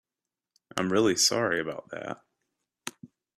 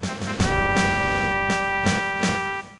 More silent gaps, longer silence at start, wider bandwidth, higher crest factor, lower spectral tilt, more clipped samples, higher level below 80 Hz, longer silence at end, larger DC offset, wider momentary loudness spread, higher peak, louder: neither; first, 0.75 s vs 0 s; first, 15 kHz vs 11 kHz; first, 22 dB vs 16 dB; second, -2.5 dB/octave vs -4.5 dB/octave; neither; second, -70 dBFS vs -38 dBFS; first, 0.3 s vs 0 s; neither; first, 19 LU vs 4 LU; second, -10 dBFS vs -6 dBFS; second, -26 LUFS vs -22 LUFS